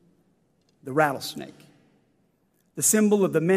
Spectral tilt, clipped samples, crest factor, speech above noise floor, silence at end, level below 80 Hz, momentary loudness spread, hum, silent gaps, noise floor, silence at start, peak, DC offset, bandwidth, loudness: -4 dB/octave; under 0.1%; 20 dB; 45 dB; 0 s; -74 dBFS; 23 LU; none; none; -68 dBFS; 0.85 s; -6 dBFS; under 0.1%; 15.5 kHz; -23 LUFS